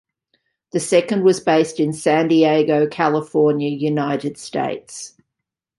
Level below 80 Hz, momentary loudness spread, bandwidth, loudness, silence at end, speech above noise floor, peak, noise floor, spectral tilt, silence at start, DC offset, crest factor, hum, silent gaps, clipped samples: -64 dBFS; 11 LU; 11.5 kHz; -18 LUFS; 0.7 s; 64 dB; -2 dBFS; -82 dBFS; -5.5 dB/octave; 0.75 s; under 0.1%; 16 dB; none; none; under 0.1%